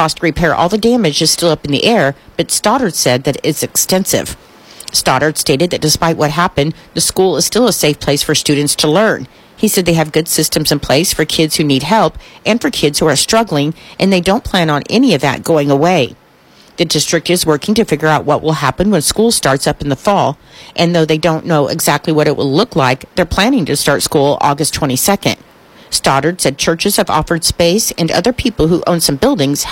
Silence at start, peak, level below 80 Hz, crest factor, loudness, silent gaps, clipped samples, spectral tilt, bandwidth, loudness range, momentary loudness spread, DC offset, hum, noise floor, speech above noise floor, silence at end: 0 s; 0 dBFS; -36 dBFS; 12 dB; -12 LUFS; none; under 0.1%; -4 dB/octave; 16.5 kHz; 1 LU; 5 LU; under 0.1%; none; -44 dBFS; 32 dB; 0 s